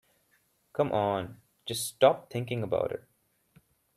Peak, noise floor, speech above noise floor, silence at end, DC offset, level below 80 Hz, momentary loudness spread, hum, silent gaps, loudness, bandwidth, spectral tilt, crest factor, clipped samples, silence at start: -8 dBFS; -70 dBFS; 42 dB; 1 s; under 0.1%; -66 dBFS; 16 LU; none; none; -30 LUFS; 14.5 kHz; -5 dB/octave; 22 dB; under 0.1%; 0.75 s